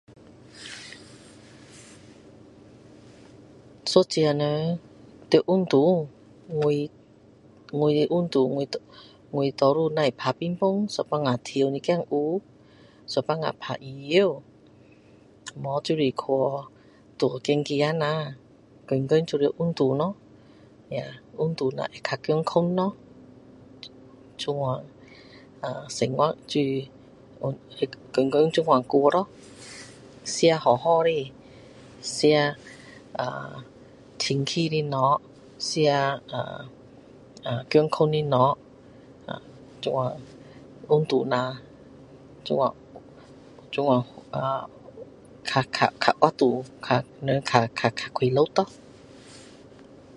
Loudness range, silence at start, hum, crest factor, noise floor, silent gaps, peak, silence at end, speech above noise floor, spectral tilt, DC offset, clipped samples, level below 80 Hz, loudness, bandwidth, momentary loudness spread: 5 LU; 0.55 s; none; 26 dB; -54 dBFS; none; 0 dBFS; 0.7 s; 30 dB; -5.5 dB/octave; under 0.1%; under 0.1%; -64 dBFS; -25 LUFS; 11.5 kHz; 20 LU